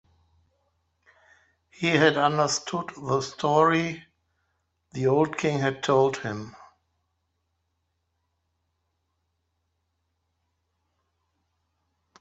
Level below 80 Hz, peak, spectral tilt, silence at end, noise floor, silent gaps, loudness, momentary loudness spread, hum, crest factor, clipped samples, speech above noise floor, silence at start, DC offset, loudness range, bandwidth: -68 dBFS; -4 dBFS; -5 dB/octave; 5.65 s; -77 dBFS; none; -24 LUFS; 13 LU; none; 24 dB; under 0.1%; 53 dB; 1.8 s; under 0.1%; 6 LU; 8.2 kHz